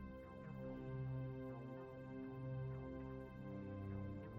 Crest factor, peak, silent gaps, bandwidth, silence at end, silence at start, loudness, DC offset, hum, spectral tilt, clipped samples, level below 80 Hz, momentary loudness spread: 12 dB; -38 dBFS; none; 5 kHz; 0 s; 0 s; -50 LUFS; under 0.1%; none; -10 dB/octave; under 0.1%; -64 dBFS; 6 LU